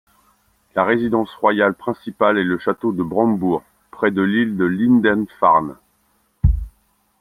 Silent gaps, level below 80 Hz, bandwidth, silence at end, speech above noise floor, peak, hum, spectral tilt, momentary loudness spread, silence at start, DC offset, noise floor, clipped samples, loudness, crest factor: none; -32 dBFS; 13 kHz; 0.5 s; 45 dB; -2 dBFS; none; -8.5 dB/octave; 10 LU; 0.75 s; under 0.1%; -63 dBFS; under 0.1%; -18 LUFS; 18 dB